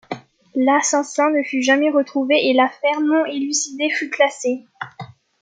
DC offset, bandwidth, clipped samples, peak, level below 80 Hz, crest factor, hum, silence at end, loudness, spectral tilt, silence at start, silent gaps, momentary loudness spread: under 0.1%; 9.6 kHz; under 0.1%; -2 dBFS; -76 dBFS; 16 dB; none; 0.35 s; -18 LUFS; -2 dB/octave; 0.1 s; none; 17 LU